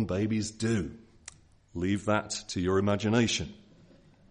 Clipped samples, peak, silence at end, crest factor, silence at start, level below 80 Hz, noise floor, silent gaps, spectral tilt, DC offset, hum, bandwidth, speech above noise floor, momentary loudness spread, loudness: under 0.1%; -10 dBFS; 0.75 s; 20 dB; 0 s; -58 dBFS; -58 dBFS; none; -5 dB/octave; under 0.1%; none; 10.5 kHz; 29 dB; 20 LU; -29 LUFS